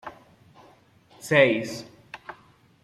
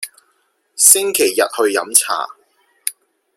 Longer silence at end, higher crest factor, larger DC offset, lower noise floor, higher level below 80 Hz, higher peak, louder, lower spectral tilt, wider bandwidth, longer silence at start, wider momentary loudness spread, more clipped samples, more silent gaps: about the same, 0.5 s vs 0.45 s; about the same, 22 dB vs 18 dB; neither; second, -57 dBFS vs -63 dBFS; about the same, -66 dBFS vs -64 dBFS; second, -6 dBFS vs 0 dBFS; second, -22 LUFS vs -13 LUFS; first, -5 dB/octave vs 0.5 dB/octave; about the same, 15 kHz vs 16.5 kHz; about the same, 0.05 s vs 0 s; first, 25 LU vs 19 LU; second, under 0.1% vs 0.1%; neither